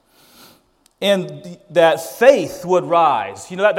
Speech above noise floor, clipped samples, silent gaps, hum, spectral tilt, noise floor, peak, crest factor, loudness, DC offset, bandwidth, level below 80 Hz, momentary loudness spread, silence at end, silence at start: 40 dB; under 0.1%; none; none; -4.5 dB/octave; -56 dBFS; 0 dBFS; 18 dB; -16 LUFS; under 0.1%; 16.5 kHz; -62 dBFS; 11 LU; 0 s; 1 s